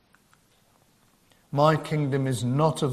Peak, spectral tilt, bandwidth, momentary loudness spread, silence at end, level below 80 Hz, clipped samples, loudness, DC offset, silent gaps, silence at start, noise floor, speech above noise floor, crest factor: -6 dBFS; -6.5 dB/octave; 14 kHz; 5 LU; 0 s; -62 dBFS; under 0.1%; -25 LUFS; under 0.1%; none; 1.5 s; -62 dBFS; 39 dB; 20 dB